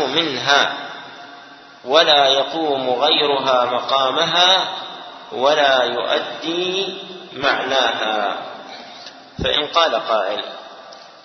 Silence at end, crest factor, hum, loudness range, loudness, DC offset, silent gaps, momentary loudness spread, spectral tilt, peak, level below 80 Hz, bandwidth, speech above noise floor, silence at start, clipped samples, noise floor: 0.15 s; 20 dB; none; 6 LU; -17 LUFS; under 0.1%; none; 21 LU; -2.5 dB/octave; 0 dBFS; -50 dBFS; 6.4 kHz; 23 dB; 0 s; under 0.1%; -41 dBFS